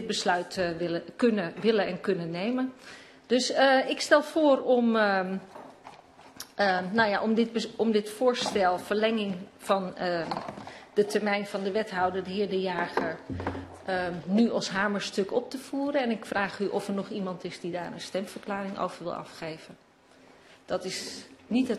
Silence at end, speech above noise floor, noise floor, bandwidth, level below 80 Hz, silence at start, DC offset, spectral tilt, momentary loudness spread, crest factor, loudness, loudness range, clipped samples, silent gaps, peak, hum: 0 s; 29 dB; -57 dBFS; 13 kHz; -64 dBFS; 0 s; under 0.1%; -4.5 dB/octave; 13 LU; 22 dB; -28 LUFS; 9 LU; under 0.1%; none; -8 dBFS; none